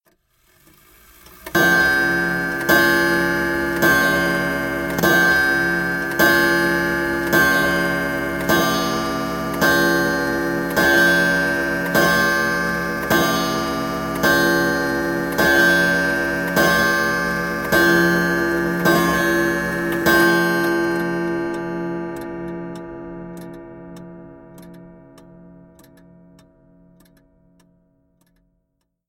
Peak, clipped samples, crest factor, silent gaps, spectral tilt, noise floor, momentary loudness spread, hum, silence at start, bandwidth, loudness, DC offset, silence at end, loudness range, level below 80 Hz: -2 dBFS; under 0.1%; 16 dB; none; -4 dB/octave; -72 dBFS; 12 LU; none; 1.4 s; 17 kHz; -17 LUFS; under 0.1%; 4.15 s; 8 LU; -44 dBFS